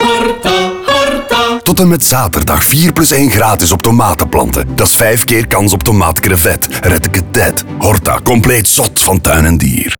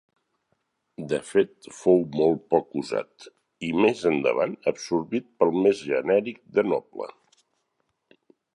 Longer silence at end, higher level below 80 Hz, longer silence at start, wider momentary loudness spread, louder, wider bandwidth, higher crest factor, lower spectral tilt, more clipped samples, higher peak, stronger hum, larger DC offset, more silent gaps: second, 0.05 s vs 1.45 s; first, -26 dBFS vs -64 dBFS; second, 0 s vs 1 s; second, 4 LU vs 10 LU; first, -9 LUFS vs -25 LUFS; first, over 20 kHz vs 11 kHz; second, 10 dB vs 20 dB; second, -4 dB/octave vs -6 dB/octave; neither; first, 0 dBFS vs -6 dBFS; neither; first, 1% vs under 0.1%; neither